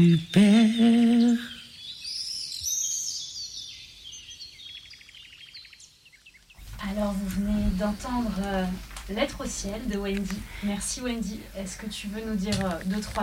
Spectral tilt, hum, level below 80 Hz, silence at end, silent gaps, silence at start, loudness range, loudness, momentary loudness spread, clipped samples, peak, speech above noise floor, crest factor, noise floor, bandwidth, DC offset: -4.5 dB/octave; none; -42 dBFS; 0 s; none; 0 s; 13 LU; -27 LUFS; 21 LU; under 0.1%; -10 dBFS; 29 dB; 16 dB; -55 dBFS; 16 kHz; under 0.1%